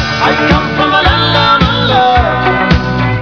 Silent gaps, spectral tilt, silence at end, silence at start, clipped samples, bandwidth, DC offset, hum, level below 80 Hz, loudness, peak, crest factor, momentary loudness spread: none; -6 dB/octave; 0 s; 0 s; 0.3%; 5.4 kHz; 0.7%; none; -22 dBFS; -9 LUFS; 0 dBFS; 10 dB; 3 LU